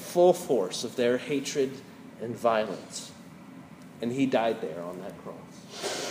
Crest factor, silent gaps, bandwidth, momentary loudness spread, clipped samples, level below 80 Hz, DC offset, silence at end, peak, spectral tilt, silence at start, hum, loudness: 20 dB; none; 15.5 kHz; 22 LU; under 0.1%; -74 dBFS; under 0.1%; 0 s; -10 dBFS; -4.5 dB/octave; 0 s; none; -29 LUFS